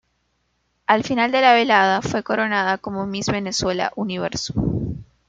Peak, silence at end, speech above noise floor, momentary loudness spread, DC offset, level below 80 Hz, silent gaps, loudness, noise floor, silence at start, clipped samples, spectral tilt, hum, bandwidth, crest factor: -2 dBFS; 0.25 s; 49 dB; 11 LU; under 0.1%; -44 dBFS; none; -20 LUFS; -69 dBFS; 0.9 s; under 0.1%; -4.5 dB/octave; none; 9.2 kHz; 18 dB